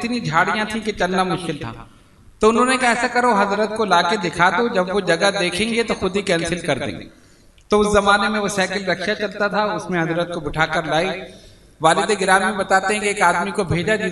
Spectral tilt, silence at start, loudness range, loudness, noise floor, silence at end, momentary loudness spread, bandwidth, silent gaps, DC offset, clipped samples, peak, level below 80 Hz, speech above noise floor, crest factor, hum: -4 dB/octave; 0 s; 3 LU; -18 LUFS; -50 dBFS; 0 s; 7 LU; 12 kHz; none; under 0.1%; under 0.1%; 0 dBFS; -44 dBFS; 31 dB; 18 dB; none